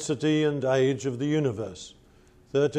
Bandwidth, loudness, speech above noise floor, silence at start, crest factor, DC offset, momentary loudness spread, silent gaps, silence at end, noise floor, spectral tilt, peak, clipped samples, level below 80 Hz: 10.5 kHz; -26 LUFS; 31 dB; 0 s; 14 dB; under 0.1%; 13 LU; none; 0 s; -56 dBFS; -6 dB/octave; -12 dBFS; under 0.1%; -62 dBFS